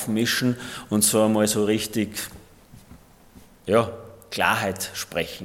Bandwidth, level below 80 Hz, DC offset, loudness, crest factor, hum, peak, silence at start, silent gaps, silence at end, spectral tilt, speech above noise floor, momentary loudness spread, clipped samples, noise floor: 17 kHz; -56 dBFS; under 0.1%; -23 LUFS; 20 dB; none; -4 dBFS; 0 s; none; 0 s; -3.5 dB/octave; 27 dB; 13 LU; under 0.1%; -50 dBFS